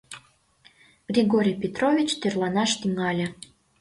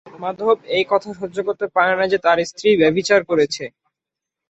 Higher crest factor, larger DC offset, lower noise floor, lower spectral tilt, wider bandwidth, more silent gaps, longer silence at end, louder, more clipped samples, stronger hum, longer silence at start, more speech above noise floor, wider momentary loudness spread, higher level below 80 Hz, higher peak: about the same, 18 dB vs 16 dB; neither; second, -59 dBFS vs -85 dBFS; about the same, -4.5 dB/octave vs -4.5 dB/octave; first, 11.5 kHz vs 8.2 kHz; neither; second, 0.45 s vs 0.8 s; second, -24 LUFS vs -18 LUFS; neither; neither; about the same, 0.1 s vs 0.05 s; second, 35 dB vs 67 dB; first, 14 LU vs 11 LU; about the same, -62 dBFS vs -58 dBFS; second, -8 dBFS vs -2 dBFS